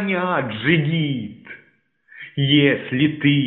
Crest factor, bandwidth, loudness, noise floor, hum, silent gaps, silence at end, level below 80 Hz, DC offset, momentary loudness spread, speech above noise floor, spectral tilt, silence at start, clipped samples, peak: 18 dB; 4.1 kHz; -19 LUFS; -59 dBFS; none; none; 0 s; -58 dBFS; under 0.1%; 20 LU; 40 dB; -4.5 dB/octave; 0 s; under 0.1%; -2 dBFS